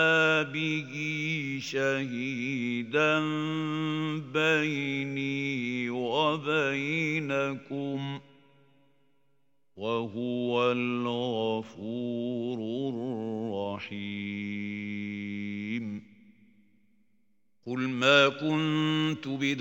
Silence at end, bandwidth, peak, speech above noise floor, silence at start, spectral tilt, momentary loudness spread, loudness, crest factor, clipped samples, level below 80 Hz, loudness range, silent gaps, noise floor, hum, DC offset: 0 s; 16.5 kHz; -8 dBFS; 47 dB; 0 s; -5.5 dB/octave; 10 LU; -29 LUFS; 22 dB; under 0.1%; -78 dBFS; 8 LU; none; -76 dBFS; none; under 0.1%